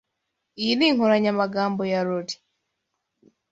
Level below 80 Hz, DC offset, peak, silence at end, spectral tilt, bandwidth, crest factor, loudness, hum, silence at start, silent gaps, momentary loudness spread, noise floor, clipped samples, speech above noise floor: -68 dBFS; under 0.1%; -6 dBFS; 1.15 s; -5.5 dB/octave; 8 kHz; 18 dB; -22 LUFS; none; 0.55 s; none; 11 LU; -79 dBFS; under 0.1%; 57 dB